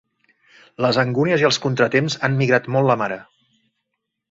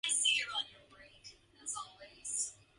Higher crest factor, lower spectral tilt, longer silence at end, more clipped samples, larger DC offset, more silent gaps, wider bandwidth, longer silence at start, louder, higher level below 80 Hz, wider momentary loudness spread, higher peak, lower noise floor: about the same, 18 dB vs 22 dB; first, -5.5 dB/octave vs 2.5 dB/octave; first, 1.1 s vs 0.25 s; neither; neither; neither; second, 7.8 kHz vs 11.5 kHz; first, 0.8 s vs 0.05 s; first, -19 LUFS vs -35 LUFS; first, -60 dBFS vs -74 dBFS; second, 5 LU vs 25 LU; first, -2 dBFS vs -18 dBFS; first, -78 dBFS vs -60 dBFS